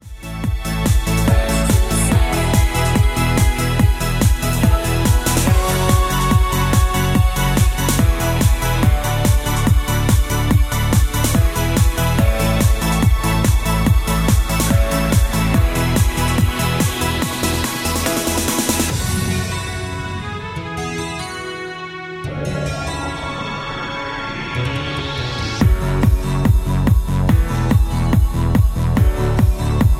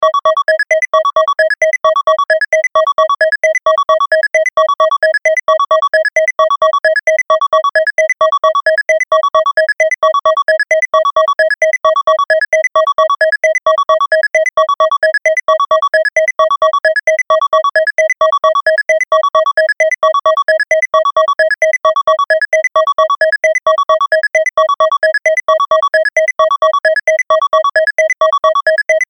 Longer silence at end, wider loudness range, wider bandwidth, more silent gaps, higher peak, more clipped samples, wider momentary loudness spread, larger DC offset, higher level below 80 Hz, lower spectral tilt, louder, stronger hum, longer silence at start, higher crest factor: about the same, 0 s vs 0.05 s; first, 8 LU vs 0 LU; first, 16.5 kHz vs 10.5 kHz; neither; about the same, -2 dBFS vs -2 dBFS; neither; first, 8 LU vs 1 LU; second, under 0.1% vs 0.1%; first, -20 dBFS vs -56 dBFS; first, -5 dB/octave vs 1 dB/octave; second, -17 LUFS vs -11 LUFS; neither; about the same, 0.05 s vs 0 s; about the same, 14 dB vs 10 dB